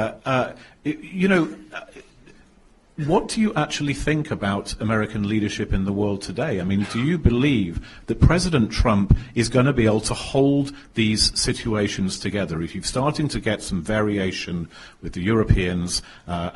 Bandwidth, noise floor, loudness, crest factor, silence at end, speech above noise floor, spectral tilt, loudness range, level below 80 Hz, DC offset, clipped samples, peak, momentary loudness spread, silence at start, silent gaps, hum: 11.5 kHz; -54 dBFS; -22 LUFS; 22 dB; 0 s; 32 dB; -5.5 dB/octave; 5 LU; -34 dBFS; under 0.1%; under 0.1%; 0 dBFS; 11 LU; 0 s; none; none